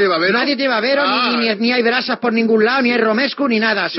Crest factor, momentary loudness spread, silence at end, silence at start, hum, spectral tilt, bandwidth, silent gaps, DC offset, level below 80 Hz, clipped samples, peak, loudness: 12 dB; 3 LU; 0 s; 0 s; none; -1.5 dB/octave; 6 kHz; none; under 0.1%; -80 dBFS; under 0.1%; -4 dBFS; -15 LUFS